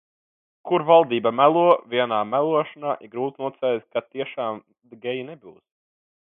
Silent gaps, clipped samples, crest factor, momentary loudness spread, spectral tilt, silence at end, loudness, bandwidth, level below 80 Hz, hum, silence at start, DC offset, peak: none; under 0.1%; 22 dB; 15 LU; -9 dB/octave; 0.85 s; -22 LUFS; 3.9 kHz; -76 dBFS; none; 0.65 s; under 0.1%; -2 dBFS